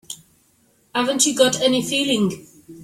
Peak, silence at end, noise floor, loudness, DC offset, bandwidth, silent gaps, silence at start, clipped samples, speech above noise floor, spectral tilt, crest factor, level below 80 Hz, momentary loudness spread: -2 dBFS; 0 s; -60 dBFS; -19 LUFS; under 0.1%; 16 kHz; none; 0.1 s; under 0.1%; 41 dB; -2.5 dB/octave; 18 dB; -62 dBFS; 21 LU